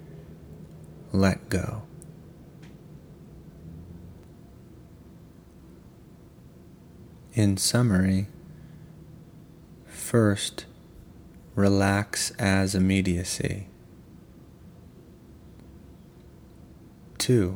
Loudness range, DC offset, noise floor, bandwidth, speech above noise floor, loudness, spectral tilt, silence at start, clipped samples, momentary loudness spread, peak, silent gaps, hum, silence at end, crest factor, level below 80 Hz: 22 LU; under 0.1%; -50 dBFS; 20 kHz; 26 dB; -25 LUFS; -5 dB/octave; 0 s; under 0.1%; 27 LU; -6 dBFS; none; none; 0 s; 24 dB; -52 dBFS